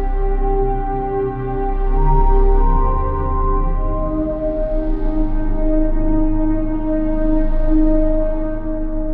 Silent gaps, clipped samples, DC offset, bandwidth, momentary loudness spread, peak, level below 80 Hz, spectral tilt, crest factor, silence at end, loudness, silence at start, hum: none; under 0.1%; under 0.1%; 2.5 kHz; 5 LU; -4 dBFS; -16 dBFS; -12 dB/octave; 12 dB; 0 s; -20 LUFS; 0 s; none